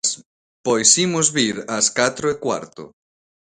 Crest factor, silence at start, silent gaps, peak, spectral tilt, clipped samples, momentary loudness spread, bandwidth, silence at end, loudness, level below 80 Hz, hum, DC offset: 20 dB; 0.05 s; 0.26-0.64 s; 0 dBFS; -2 dB/octave; under 0.1%; 14 LU; 16 kHz; 0.65 s; -18 LUFS; -60 dBFS; none; under 0.1%